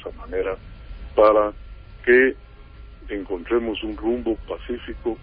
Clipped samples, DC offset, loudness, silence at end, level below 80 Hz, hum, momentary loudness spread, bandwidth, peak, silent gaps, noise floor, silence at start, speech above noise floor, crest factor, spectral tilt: under 0.1%; under 0.1%; -22 LUFS; 0 s; -40 dBFS; none; 18 LU; 5 kHz; -4 dBFS; none; -42 dBFS; 0 s; 21 dB; 18 dB; -10 dB/octave